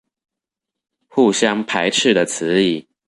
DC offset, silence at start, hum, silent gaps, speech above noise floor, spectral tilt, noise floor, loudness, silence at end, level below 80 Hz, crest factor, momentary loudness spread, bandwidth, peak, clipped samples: under 0.1%; 1.15 s; none; none; 68 dB; -3.5 dB/octave; -84 dBFS; -17 LUFS; 0.25 s; -62 dBFS; 16 dB; 4 LU; 11.5 kHz; -2 dBFS; under 0.1%